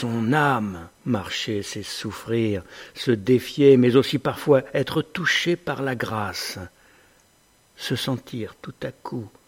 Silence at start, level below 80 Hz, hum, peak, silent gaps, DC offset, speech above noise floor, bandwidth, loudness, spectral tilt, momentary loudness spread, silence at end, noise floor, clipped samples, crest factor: 0 s; -58 dBFS; none; -4 dBFS; none; under 0.1%; 37 dB; 16.5 kHz; -23 LUFS; -5.5 dB/octave; 16 LU; 0.2 s; -59 dBFS; under 0.1%; 20 dB